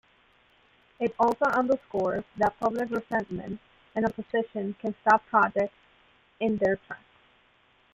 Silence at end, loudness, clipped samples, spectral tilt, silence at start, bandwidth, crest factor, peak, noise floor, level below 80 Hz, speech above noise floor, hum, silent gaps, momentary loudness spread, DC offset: 0.95 s; -27 LUFS; under 0.1%; -7 dB/octave; 1 s; 15 kHz; 22 dB; -8 dBFS; -64 dBFS; -62 dBFS; 37 dB; none; none; 13 LU; under 0.1%